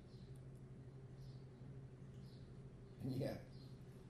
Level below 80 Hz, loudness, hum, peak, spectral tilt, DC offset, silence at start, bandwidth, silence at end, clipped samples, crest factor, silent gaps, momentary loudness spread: -68 dBFS; -53 LUFS; none; -34 dBFS; -8 dB/octave; under 0.1%; 0 s; 13 kHz; 0 s; under 0.1%; 20 dB; none; 12 LU